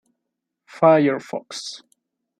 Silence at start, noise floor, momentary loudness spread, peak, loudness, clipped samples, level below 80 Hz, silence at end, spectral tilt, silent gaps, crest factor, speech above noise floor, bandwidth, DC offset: 0.75 s; -81 dBFS; 18 LU; -2 dBFS; -19 LUFS; under 0.1%; -74 dBFS; 0.65 s; -5.5 dB/octave; none; 20 dB; 62 dB; 10.5 kHz; under 0.1%